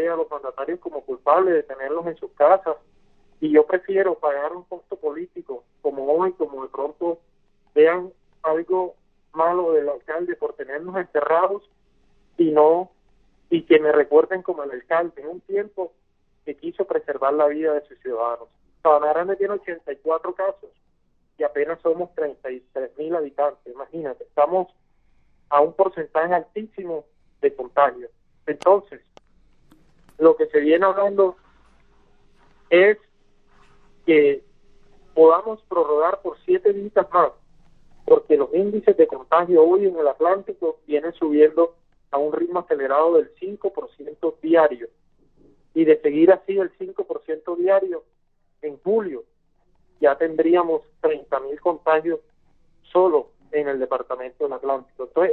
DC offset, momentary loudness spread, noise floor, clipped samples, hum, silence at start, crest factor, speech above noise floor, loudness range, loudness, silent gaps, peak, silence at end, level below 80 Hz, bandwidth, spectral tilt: under 0.1%; 15 LU; -64 dBFS; under 0.1%; none; 0 s; 18 dB; 43 dB; 6 LU; -21 LUFS; none; -2 dBFS; 0 s; -64 dBFS; 4.2 kHz; -8 dB/octave